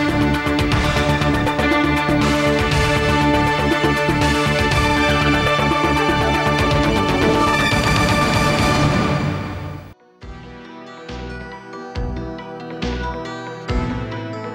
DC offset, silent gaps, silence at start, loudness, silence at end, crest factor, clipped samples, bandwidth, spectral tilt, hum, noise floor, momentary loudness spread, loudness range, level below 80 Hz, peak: under 0.1%; none; 0 s; -17 LUFS; 0 s; 12 dB; under 0.1%; 16.5 kHz; -5.5 dB/octave; none; -39 dBFS; 16 LU; 13 LU; -30 dBFS; -6 dBFS